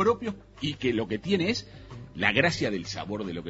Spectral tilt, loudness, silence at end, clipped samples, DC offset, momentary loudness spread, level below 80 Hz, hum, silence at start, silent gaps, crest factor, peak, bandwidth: -5 dB/octave; -28 LUFS; 0 s; under 0.1%; under 0.1%; 13 LU; -54 dBFS; none; 0 s; none; 24 dB; -4 dBFS; 8 kHz